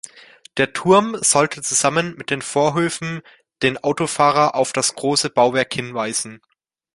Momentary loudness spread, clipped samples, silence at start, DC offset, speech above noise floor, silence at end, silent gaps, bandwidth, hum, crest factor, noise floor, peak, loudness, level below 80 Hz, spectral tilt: 10 LU; under 0.1%; 0.05 s; under 0.1%; 28 dB; 0.6 s; none; 11.5 kHz; none; 18 dB; -46 dBFS; -2 dBFS; -18 LUFS; -58 dBFS; -3 dB/octave